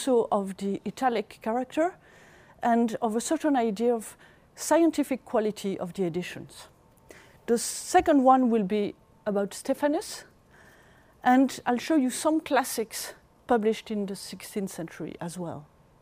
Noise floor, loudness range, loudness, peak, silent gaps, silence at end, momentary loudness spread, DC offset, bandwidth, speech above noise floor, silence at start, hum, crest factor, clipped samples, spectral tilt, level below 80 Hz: -57 dBFS; 4 LU; -27 LUFS; -8 dBFS; none; 0.35 s; 15 LU; under 0.1%; 15.5 kHz; 30 dB; 0 s; none; 20 dB; under 0.1%; -4.5 dB/octave; -62 dBFS